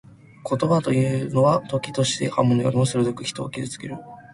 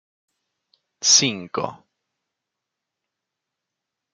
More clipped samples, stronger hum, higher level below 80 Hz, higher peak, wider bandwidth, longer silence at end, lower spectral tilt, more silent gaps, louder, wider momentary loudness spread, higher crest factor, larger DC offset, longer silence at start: neither; neither; first, -56 dBFS vs -74 dBFS; about the same, -4 dBFS vs -2 dBFS; about the same, 11.5 kHz vs 11.5 kHz; second, 0.1 s vs 2.4 s; first, -6 dB/octave vs -1 dB/octave; neither; second, -22 LUFS vs -18 LUFS; second, 12 LU vs 15 LU; second, 18 dB vs 26 dB; neither; second, 0.45 s vs 1 s